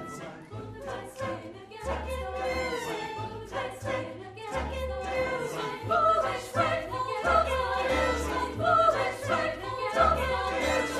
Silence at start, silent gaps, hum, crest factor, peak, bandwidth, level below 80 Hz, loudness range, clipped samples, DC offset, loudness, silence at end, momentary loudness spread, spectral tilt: 0 s; none; none; 18 dB; -10 dBFS; 15 kHz; -44 dBFS; 8 LU; under 0.1%; under 0.1%; -29 LUFS; 0 s; 14 LU; -4.5 dB/octave